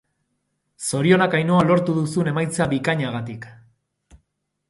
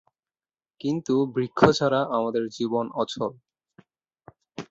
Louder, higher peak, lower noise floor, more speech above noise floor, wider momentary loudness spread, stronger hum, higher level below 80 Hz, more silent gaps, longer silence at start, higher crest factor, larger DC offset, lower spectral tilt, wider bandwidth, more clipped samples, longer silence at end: first, -20 LUFS vs -25 LUFS; about the same, -4 dBFS vs -2 dBFS; second, -73 dBFS vs under -90 dBFS; second, 53 dB vs over 66 dB; about the same, 13 LU vs 13 LU; neither; about the same, -56 dBFS vs -58 dBFS; neither; about the same, 0.8 s vs 0.85 s; second, 18 dB vs 24 dB; neither; about the same, -6 dB/octave vs -6 dB/octave; first, 11.5 kHz vs 8 kHz; neither; first, 1.15 s vs 0.05 s